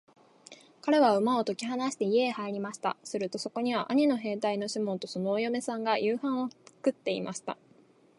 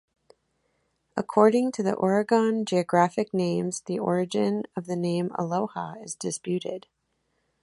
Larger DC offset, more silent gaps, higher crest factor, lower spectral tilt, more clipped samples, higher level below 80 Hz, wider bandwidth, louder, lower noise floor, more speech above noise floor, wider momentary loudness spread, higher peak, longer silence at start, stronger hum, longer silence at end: neither; neither; about the same, 18 dB vs 22 dB; about the same, -5 dB/octave vs -6 dB/octave; neither; second, -82 dBFS vs -70 dBFS; about the same, 11.5 kHz vs 11.5 kHz; second, -30 LUFS vs -26 LUFS; second, -61 dBFS vs -74 dBFS; second, 32 dB vs 49 dB; second, 9 LU vs 13 LU; second, -12 dBFS vs -4 dBFS; second, 0.5 s vs 1.15 s; neither; second, 0.65 s vs 0.85 s